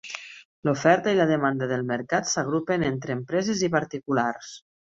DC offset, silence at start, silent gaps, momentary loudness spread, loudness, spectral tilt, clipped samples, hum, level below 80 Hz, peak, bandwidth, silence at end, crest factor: under 0.1%; 0.05 s; 0.45-0.63 s; 14 LU; -25 LUFS; -5 dB/octave; under 0.1%; none; -60 dBFS; -4 dBFS; 7.8 kHz; 0.3 s; 22 dB